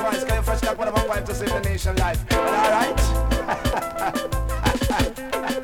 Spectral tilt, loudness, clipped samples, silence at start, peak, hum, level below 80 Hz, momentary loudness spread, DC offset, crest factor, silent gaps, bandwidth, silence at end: -5 dB/octave; -23 LUFS; under 0.1%; 0 s; -6 dBFS; none; -28 dBFS; 6 LU; under 0.1%; 16 dB; none; 18.5 kHz; 0 s